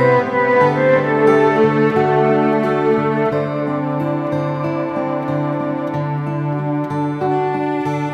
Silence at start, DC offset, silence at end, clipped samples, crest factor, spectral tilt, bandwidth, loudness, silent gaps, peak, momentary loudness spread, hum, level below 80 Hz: 0 s; under 0.1%; 0 s; under 0.1%; 16 dB; -8.5 dB/octave; 9 kHz; -17 LUFS; none; -2 dBFS; 8 LU; none; -56 dBFS